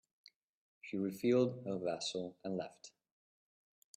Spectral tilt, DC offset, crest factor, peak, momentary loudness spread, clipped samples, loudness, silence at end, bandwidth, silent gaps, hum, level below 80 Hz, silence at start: -5.5 dB/octave; under 0.1%; 20 dB; -20 dBFS; 21 LU; under 0.1%; -38 LUFS; 1.1 s; 14.5 kHz; none; none; -82 dBFS; 0.85 s